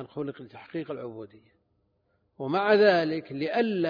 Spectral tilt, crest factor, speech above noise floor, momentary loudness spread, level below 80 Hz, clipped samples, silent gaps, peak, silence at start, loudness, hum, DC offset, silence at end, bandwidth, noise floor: -7.5 dB/octave; 20 dB; 45 dB; 19 LU; -74 dBFS; under 0.1%; none; -8 dBFS; 0 s; -26 LUFS; none; under 0.1%; 0 s; 5.2 kHz; -72 dBFS